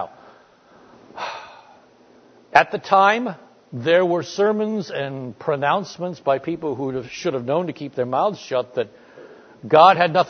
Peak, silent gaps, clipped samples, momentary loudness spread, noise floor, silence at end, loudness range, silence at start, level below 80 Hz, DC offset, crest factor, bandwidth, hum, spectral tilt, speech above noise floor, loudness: 0 dBFS; none; under 0.1%; 16 LU; -52 dBFS; 0 s; 5 LU; 0 s; -66 dBFS; under 0.1%; 22 dB; 6.6 kHz; none; -5.5 dB/octave; 32 dB; -20 LUFS